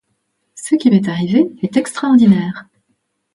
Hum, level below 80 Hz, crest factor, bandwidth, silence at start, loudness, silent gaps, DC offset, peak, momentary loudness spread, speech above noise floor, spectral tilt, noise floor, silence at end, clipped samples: none; -58 dBFS; 14 dB; 11.5 kHz; 0.55 s; -14 LUFS; none; under 0.1%; 0 dBFS; 13 LU; 55 dB; -6.5 dB/octave; -68 dBFS; 0.7 s; under 0.1%